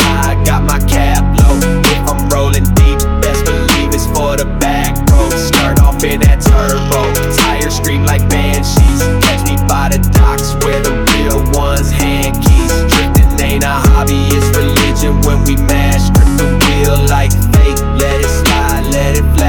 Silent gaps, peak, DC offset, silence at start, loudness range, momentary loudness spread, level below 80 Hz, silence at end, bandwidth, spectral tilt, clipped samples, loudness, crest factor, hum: none; 0 dBFS; under 0.1%; 0 s; 1 LU; 3 LU; -12 dBFS; 0 s; over 20 kHz; -5 dB/octave; under 0.1%; -11 LUFS; 10 dB; none